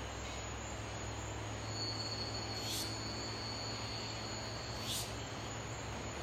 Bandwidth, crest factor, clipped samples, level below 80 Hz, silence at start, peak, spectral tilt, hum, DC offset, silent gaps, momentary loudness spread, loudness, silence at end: 16 kHz; 16 dB; under 0.1%; -54 dBFS; 0 s; -26 dBFS; -3 dB/octave; none; under 0.1%; none; 5 LU; -41 LUFS; 0 s